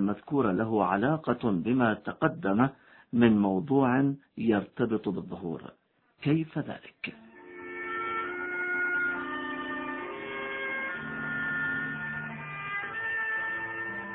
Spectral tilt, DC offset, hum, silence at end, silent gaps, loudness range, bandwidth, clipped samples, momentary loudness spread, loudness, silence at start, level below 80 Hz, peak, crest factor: -10.5 dB/octave; under 0.1%; none; 0 s; none; 7 LU; 4.3 kHz; under 0.1%; 11 LU; -30 LUFS; 0 s; -64 dBFS; -8 dBFS; 22 dB